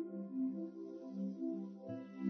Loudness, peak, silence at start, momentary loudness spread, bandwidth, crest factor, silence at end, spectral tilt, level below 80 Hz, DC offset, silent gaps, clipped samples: -44 LUFS; -26 dBFS; 0 s; 7 LU; 6.2 kHz; 16 dB; 0 s; -10 dB/octave; under -90 dBFS; under 0.1%; none; under 0.1%